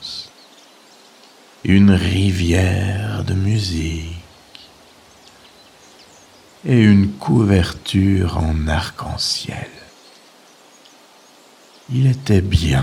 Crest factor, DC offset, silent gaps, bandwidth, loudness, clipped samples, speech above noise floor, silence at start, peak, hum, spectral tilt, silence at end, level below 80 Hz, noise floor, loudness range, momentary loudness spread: 18 dB; under 0.1%; none; 13 kHz; -17 LUFS; under 0.1%; 32 dB; 0 s; 0 dBFS; none; -6.5 dB/octave; 0 s; -36 dBFS; -48 dBFS; 9 LU; 16 LU